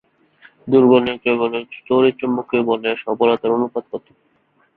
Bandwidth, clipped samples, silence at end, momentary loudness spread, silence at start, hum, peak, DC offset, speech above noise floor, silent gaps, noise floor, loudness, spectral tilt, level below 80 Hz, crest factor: 4.4 kHz; under 0.1%; 0.8 s; 14 LU; 0.65 s; none; -2 dBFS; under 0.1%; 43 dB; none; -61 dBFS; -18 LUFS; -9.5 dB/octave; -60 dBFS; 16 dB